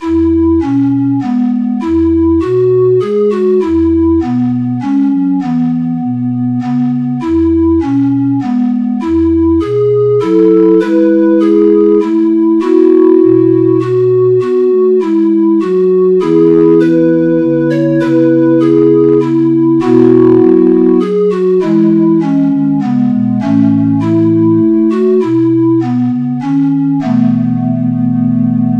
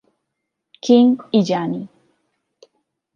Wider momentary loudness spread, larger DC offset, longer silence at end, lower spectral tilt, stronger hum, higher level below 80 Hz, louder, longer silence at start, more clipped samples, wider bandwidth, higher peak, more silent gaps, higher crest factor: second, 6 LU vs 16 LU; neither; second, 0 s vs 1.3 s; first, -10 dB/octave vs -6.5 dB/octave; neither; first, -36 dBFS vs -68 dBFS; first, -10 LUFS vs -17 LUFS; second, 0 s vs 0.85 s; first, 0.4% vs under 0.1%; second, 5.8 kHz vs 7 kHz; about the same, 0 dBFS vs -2 dBFS; neither; second, 8 dB vs 18 dB